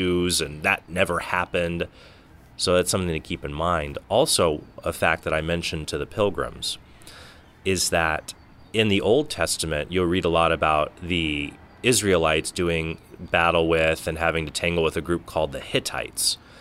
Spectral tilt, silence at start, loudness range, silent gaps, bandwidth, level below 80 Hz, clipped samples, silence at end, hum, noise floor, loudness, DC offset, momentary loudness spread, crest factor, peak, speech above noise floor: -3.5 dB/octave; 0 s; 3 LU; none; 16 kHz; -44 dBFS; under 0.1%; 0 s; none; -47 dBFS; -23 LUFS; under 0.1%; 9 LU; 20 dB; -4 dBFS; 23 dB